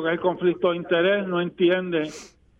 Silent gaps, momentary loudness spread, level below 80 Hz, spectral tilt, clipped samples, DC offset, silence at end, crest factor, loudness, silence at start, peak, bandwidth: none; 7 LU; -62 dBFS; -6 dB/octave; under 0.1%; under 0.1%; 0.3 s; 14 dB; -23 LUFS; 0 s; -8 dBFS; 8.4 kHz